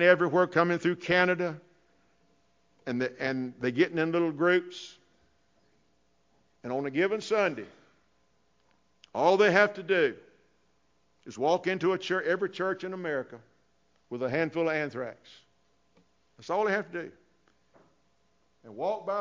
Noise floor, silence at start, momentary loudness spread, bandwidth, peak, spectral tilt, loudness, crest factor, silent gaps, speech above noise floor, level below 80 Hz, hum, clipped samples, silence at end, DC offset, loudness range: -72 dBFS; 0 s; 18 LU; 7.6 kHz; -6 dBFS; -6 dB/octave; -28 LUFS; 24 dB; none; 44 dB; -74 dBFS; none; under 0.1%; 0 s; under 0.1%; 7 LU